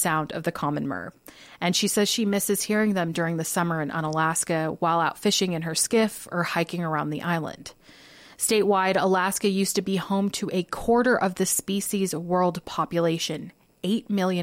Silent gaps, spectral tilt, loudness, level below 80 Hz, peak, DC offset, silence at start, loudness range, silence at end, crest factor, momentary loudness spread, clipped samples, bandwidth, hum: none; -4 dB/octave; -25 LUFS; -58 dBFS; -10 dBFS; under 0.1%; 0 s; 2 LU; 0 s; 16 dB; 7 LU; under 0.1%; 16.5 kHz; none